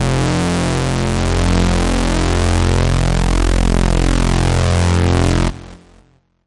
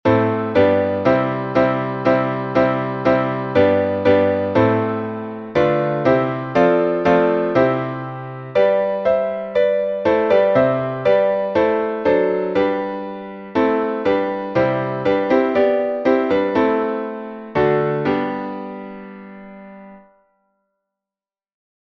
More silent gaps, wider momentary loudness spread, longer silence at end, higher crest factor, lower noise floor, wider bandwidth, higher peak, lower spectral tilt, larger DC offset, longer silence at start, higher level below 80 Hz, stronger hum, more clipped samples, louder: neither; second, 3 LU vs 12 LU; second, 0.7 s vs 1.85 s; about the same, 14 dB vs 16 dB; second, -51 dBFS vs under -90 dBFS; first, 11.5 kHz vs 6.6 kHz; about the same, 0 dBFS vs -2 dBFS; second, -5.5 dB/octave vs -8.5 dB/octave; first, 0.2% vs under 0.1%; about the same, 0 s vs 0.05 s; first, -20 dBFS vs -52 dBFS; neither; neither; about the same, -16 LUFS vs -18 LUFS